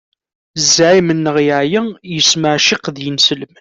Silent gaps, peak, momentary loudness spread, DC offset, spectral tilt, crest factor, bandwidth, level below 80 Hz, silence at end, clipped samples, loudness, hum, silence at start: none; 0 dBFS; 10 LU; under 0.1%; -3 dB/octave; 14 dB; 8.4 kHz; -54 dBFS; 0.15 s; under 0.1%; -12 LUFS; none; 0.55 s